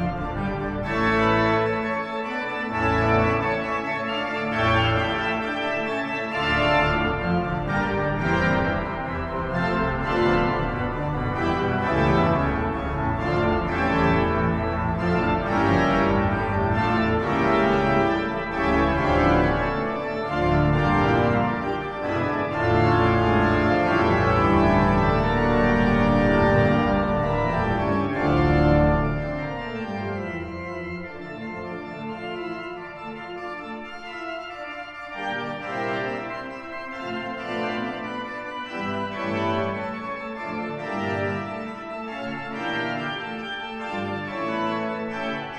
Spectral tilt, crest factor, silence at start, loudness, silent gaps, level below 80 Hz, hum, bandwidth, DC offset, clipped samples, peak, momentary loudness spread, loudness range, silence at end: -7.5 dB/octave; 16 dB; 0 s; -23 LUFS; none; -38 dBFS; none; 9.4 kHz; under 0.1%; under 0.1%; -6 dBFS; 13 LU; 11 LU; 0 s